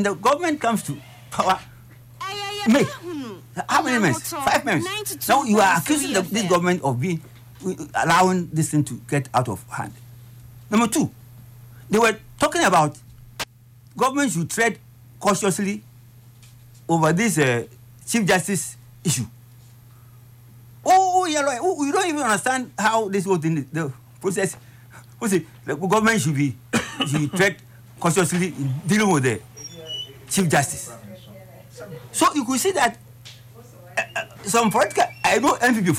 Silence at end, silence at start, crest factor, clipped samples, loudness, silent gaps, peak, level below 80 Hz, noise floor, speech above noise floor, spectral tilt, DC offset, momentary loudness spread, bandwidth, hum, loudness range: 0 s; 0 s; 16 dB; under 0.1%; -21 LUFS; none; -8 dBFS; -56 dBFS; -49 dBFS; 28 dB; -4.5 dB/octave; under 0.1%; 15 LU; 16 kHz; none; 4 LU